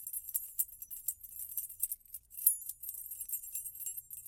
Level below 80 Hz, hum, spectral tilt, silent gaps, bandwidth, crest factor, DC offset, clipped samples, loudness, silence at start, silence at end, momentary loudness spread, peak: -70 dBFS; none; 2 dB/octave; none; 17 kHz; 30 dB; under 0.1%; under 0.1%; -36 LUFS; 0 s; 0 s; 12 LU; -10 dBFS